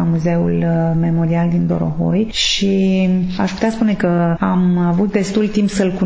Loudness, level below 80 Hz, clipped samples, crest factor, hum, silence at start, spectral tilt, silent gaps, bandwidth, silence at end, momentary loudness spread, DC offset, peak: -16 LUFS; -40 dBFS; under 0.1%; 12 dB; none; 0 s; -6.5 dB/octave; none; 8 kHz; 0 s; 3 LU; under 0.1%; -2 dBFS